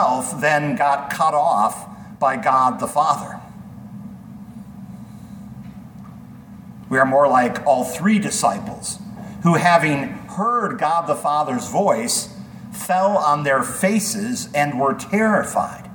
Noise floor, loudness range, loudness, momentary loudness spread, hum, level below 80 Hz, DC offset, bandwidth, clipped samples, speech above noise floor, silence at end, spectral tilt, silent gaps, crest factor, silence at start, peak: -39 dBFS; 8 LU; -19 LUFS; 21 LU; none; -56 dBFS; under 0.1%; 19 kHz; under 0.1%; 20 dB; 0 s; -4.5 dB/octave; none; 18 dB; 0 s; -2 dBFS